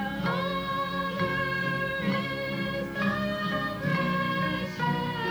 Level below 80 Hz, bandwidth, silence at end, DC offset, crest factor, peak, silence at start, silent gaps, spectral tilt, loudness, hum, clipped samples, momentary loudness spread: -52 dBFS; over 20 kHz; 0 s; under 0.1%; 14 dB; -16 dBFS; 0 s; none; -6.5 dB/octave; -29 LUFS; none; under 0.1%; 3 LU